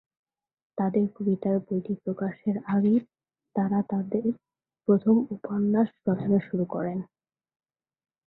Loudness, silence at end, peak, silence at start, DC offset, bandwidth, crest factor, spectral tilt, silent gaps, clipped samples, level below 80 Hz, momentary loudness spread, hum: -27 LUFS; 1.25 s; -10 dBFS; 0.75 s; under 0.1%; 4 kHz; 18 dB; -13 dB/octave; none; under 0.1%; -68 dBFS; 9 LU; none